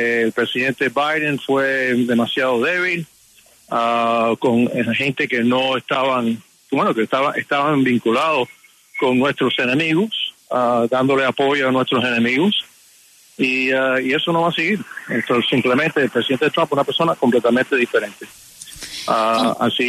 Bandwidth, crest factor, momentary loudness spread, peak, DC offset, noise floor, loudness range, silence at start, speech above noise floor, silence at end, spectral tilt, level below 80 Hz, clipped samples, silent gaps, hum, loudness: 13.5 kHz; 14 dB; 7 LU; -4 dBFS; under 0.1%; -51 dBFS; 1 LU; 0 s; 33 dB; 0 s; -5 dB/octave; -62 dBFS; under 0.1%; none; none; -18 LUFS